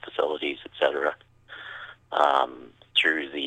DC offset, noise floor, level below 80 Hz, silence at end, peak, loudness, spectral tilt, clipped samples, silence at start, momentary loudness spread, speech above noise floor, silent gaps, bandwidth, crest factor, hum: under 0.1%; -47 dBFS; -70 dBFS; 0 s; -6 dBFS; -25 LUFS; -3 dB/octave; under 0.1%; 0.05 s; 19 LU; 22 dB; none; 10 kHz; 22 dB; none